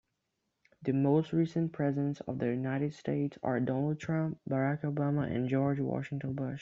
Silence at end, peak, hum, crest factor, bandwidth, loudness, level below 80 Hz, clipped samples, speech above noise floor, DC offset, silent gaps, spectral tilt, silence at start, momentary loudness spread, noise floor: 0 s; -16 dBFS; none; 16 dB; 7.4 kHz; -33 LUFS; -68 dBFS; under 0.1%; 51 dB; under 0.1%; none; -8.5 dB/octave; 0.8 s; 6 LU; -83 dBFS